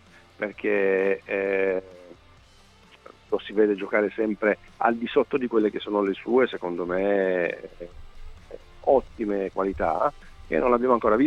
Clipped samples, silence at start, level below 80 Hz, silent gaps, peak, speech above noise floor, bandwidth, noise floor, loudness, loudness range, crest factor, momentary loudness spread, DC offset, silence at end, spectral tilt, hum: under 0.1%; 0.4 s; -50 dBFS; none; -6 dBFS; 30 dB; 7.6 kHz; -54 dBFS; -25 LUFS; 3 LU; 20 dB; 9 LU; under 0.1%; 0 s; -7.5 dB/octave; none